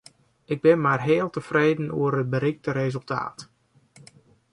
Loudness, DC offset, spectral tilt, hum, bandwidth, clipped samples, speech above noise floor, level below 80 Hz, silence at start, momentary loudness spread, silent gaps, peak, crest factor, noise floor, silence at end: -24 LUFS; under 0.1%; -7.5 dB/octave; none; 11 kHz; under 0.1%; 32 dB; -64 dBFS; 0.5 s; 10 LU; none; -6 dBFS; 18 dB; -55 dBFS; 1.1 s